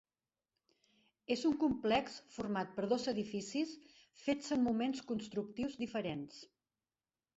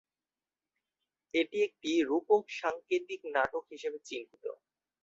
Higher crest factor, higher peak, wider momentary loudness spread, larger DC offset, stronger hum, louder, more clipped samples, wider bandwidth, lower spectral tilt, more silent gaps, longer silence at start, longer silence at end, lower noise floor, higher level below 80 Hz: about the same, 18 dB vs 20 dB; second, -20 dBFS vs -14 dBFS; about the same, 12 LU vs 14 LU; neither; neither; second, -38 LUFS vs -33 LUFS; neither; about the same, 8 kHz vs 7.8 kHz; about the same, -4 dB/octave vs -3.5 dB/octave; neither; about the same, 1.3 s vs 1.35 s; first, 0.9 s vs 0.5 s; about the same, under -90 dBFS vs under -90 dBFS; first, -70 dBFS vs -76 dBFS